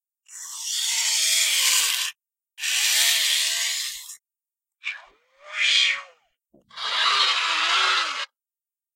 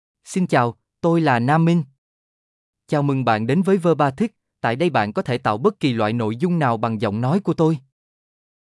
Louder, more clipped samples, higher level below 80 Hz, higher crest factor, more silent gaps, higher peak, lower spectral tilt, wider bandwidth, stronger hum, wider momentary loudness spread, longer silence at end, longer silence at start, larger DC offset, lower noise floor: about the same, -20 LUFS vs -20 LUFS; neither; second, -78 dBFS vs -64 dBFS; about the same, 20 dB vs 16 dB; second, none vs 1.98-2.73 s; about the same, -6 dBFS vs -4 dBFS; second, 5 dB/octave vs -7.5 dB/octave; first, 16 kHz vs 11.5 kHz; neither; first, 17 LU vs 7 LU; second, 0.7 s vs 0.85 s; about the same, 0.3 s vs 0.25 s; neither; about the same, under -90 dBFS vs under -90 dBFS